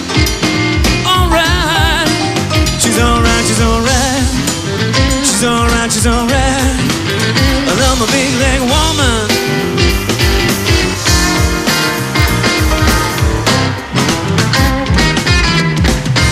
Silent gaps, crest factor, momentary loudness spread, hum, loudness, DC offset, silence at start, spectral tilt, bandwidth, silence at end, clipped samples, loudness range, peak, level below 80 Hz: none; 12 dB; 3 LU; none; -11 LUFS; under 0.1%; 0 s; -4 dB/octave; 16 kHz; 0 s; under 0.1%; 1 LU; 0 dBFS; -20 dBFS